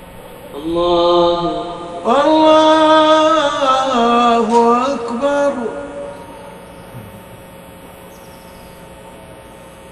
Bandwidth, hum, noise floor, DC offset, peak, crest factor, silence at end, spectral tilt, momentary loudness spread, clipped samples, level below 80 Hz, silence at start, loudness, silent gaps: 13 kHz; none; -37 dBFS; under 0.1%; 0 dBFS; 16 dB; 0 s; -4.5 dB/octave; 25 LU; under 0.1%; -46 dBFS; 0 s; -13 LUFS; none